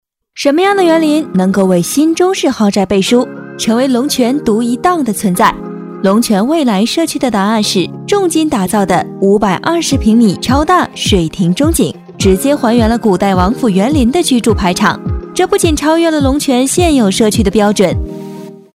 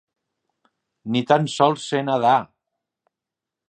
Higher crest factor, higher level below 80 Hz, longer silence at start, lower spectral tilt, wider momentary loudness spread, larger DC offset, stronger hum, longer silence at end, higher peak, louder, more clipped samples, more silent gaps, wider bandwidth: second, 12 dB vs 22 dB; first, -28 dBFS vs -70 dBFS; second, 0.35 s vs 1.05 s; about the same, -5 dB/octave vs -5.5 dB/octave; about the same, 5 LU vs 7 LU; neither; neither; second, 0.15 s vs 1.25 s; about the same, 0 dBFS vs -2 dBFS; first, -11 LUFS vs -20 LUFS; first, 0.4% vs under 0.1%; neither; first, 16 kHz vs 9.2 kHz